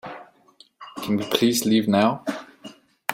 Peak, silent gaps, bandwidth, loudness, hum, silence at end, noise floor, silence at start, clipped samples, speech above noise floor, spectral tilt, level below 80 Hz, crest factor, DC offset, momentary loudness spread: -2 dBFS; none; 16 kHz; -22 LUFS; none; 0 s; -55 dBFS; 0.05 s; under 0.1%; 35 dB; -4.5 dB/octave; -64 dBFS; 22 dB; under 0.1%; 21 LU